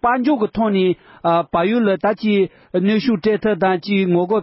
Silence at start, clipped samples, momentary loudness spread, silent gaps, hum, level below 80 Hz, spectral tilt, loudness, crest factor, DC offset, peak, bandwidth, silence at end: 0.05 s; under 0.1%; 2 LU; none; none; -52 dBFS; -11.5 dB/octave; -18 LUFS; 12 dB; under 0.1%; -6 dBFS; 5.8 kHz; 0 s